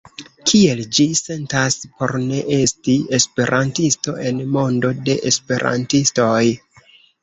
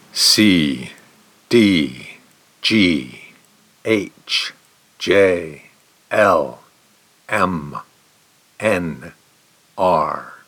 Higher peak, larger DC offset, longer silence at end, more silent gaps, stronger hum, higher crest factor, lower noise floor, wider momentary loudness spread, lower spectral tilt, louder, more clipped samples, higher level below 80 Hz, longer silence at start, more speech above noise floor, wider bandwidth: about the same, -2 dBFS vs -2 dBFS; neither; first, 0.65 s vs 0.15 s; neither; neither; about the same, 16 dB vs 18 dB; second, -50 dBFS vs -55 dBFS; second, 6 LU vs 20 LU; about the same, -4 dB/octave vs -4 dB/octave; about the same, -17 LUFS vs -17 LUFS; neither; about the same, -52 dBFS vs -54 dBFS; about the same, 0.2 s vs 0.15 s; second, 32 dB vs 39 dB; second, 8.2 kHz vs 19.5 kHz